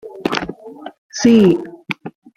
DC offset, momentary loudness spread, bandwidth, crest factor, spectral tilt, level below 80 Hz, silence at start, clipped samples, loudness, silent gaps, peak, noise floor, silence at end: under 0.1%; 23 LU; 10 kHz; 16 dB; -5.5 dB/octave; -52 dBFS; 0.05 s; under 0.1%; -16 LUFS; 0.98-1.10 s; -2 dBFS; -32 dBFS; 0.3 s